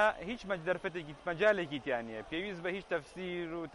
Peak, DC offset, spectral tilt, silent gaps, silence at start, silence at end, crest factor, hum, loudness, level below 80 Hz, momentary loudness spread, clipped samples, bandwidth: -16 dBFS; under 0.1%; -5.5 dB/octave; none; 0 s; 0 s; 20 dB; none; -36 LUFS; -62 dBFS; 10 LU; under 0.1%; 11.5 kHz